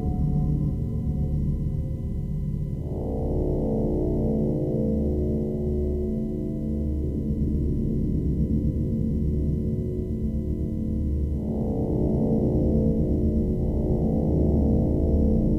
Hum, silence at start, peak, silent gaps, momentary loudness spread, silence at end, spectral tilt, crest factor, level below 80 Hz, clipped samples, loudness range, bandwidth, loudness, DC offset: none; 0 s; -10 dBFS; none; 6 LU; 0 s; -12 dB/octave; 14 dB; -30 dBFS; under 0.1%; 4 LU; 3.2 kHz; -26 LUFS; under 0.1%